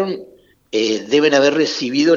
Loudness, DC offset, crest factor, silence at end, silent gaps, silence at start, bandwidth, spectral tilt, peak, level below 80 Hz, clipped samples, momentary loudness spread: -16 LUFS; under 0.1%; 16 dB; 0 s; none; 0 s; 7.6 kHz; -4 dB/octave; 0 dBFS; -66 dBFS; under 0.1%; 11 LU